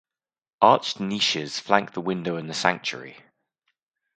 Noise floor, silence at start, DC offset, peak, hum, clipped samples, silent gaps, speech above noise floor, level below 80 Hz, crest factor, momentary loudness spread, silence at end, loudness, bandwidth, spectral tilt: -76 dBFS; 0.6 s; under 0.1%; 0 dBFS; none; under 0.1%; none; 52 dB; -70 dBFS; 26 dB; 11 LU; 1 s; -23 LUFS; 9.4 kHz; -3.5 dB/octave